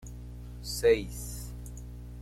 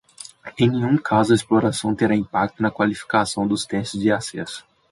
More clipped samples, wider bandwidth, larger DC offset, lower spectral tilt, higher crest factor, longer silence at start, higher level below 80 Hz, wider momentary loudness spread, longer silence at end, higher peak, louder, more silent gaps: neither; first, 16 kHz vs 11.5 kHz; neither; about the same, -4.5 dB/octave vs -5.5 dB/octave; about the same, 20 dB vs 16 dB; second, 0 s vs 0.2 s; first, -44 dBFS vs -54 dBFS; first, 19 LU vs 15 LU; second, 0 s vs 0.3 s; second, -12 dBFS vs -4 dBFS; second, -30 LUFS vs -21 LUFS; neither